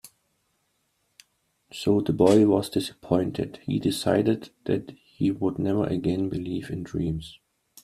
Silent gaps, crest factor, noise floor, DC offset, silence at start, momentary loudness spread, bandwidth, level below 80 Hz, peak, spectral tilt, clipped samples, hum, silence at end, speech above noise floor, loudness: none; 22 dB; -73 dBFS; under 0.1%; 0.05 s; 12 LU; 14.5 kHz; -54 dBFS; -4 dBFS; -6.5 dB/octave; under 0.1%; none; 0.5 s; 48 dB; -25 LUFS